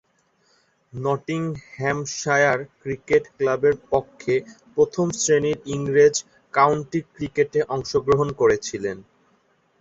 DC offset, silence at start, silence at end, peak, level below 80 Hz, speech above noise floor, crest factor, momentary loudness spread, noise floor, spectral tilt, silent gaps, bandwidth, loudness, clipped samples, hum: under 0.1%; 0.95 s; 0.8 s; -4 dBFS; -54 dBFS; 43 dB; 20 dB; 10 LU; -64 dBFS; -4.5 dB/octave; none; 8 kHz; -22 LUFS; under 0.1%; none